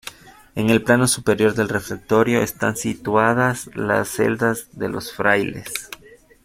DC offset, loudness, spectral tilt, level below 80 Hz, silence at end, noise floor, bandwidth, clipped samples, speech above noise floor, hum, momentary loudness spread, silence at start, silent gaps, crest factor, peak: under 0.1%; -20 LUFS; -4.5 dB/octave; -52 dBFS; 0.5 s; -48 dBFS; 16.5 kHz; under 0.1%; 29 dB; none; 13 LU; 0.05 s; none; 20 dB; -2 dBFS